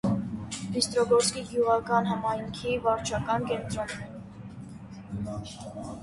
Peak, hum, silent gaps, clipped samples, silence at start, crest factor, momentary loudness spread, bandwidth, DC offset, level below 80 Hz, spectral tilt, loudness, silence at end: -10 dBFS; none; none; under 0.1%; 0.05 s; 18 dB; 19 LU; 11.5 kHz; under 0.1%; -52 dBFS; -4.5 dB/octave; -28 LUFS; 0 s